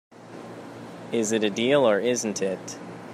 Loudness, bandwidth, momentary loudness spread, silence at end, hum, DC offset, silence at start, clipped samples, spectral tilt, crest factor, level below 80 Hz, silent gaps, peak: -24 LUFS; 14.5 kHz; 20 LU; 0 s; none; under 0.1%; 0.15 s; under 0.1%; -4 dB/octave; 18 dB; -74 dBFS; none; -8 dBFS